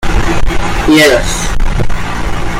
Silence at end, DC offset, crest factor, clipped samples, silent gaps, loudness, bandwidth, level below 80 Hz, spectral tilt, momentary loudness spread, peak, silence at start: 0 s; under 0.1%; 8 dB; under 0.1%; none; -12 LUFS; 16 kHz; -14 dBFS; -4.5 dB/octave; 11 LU; 0 dBFS; 0 s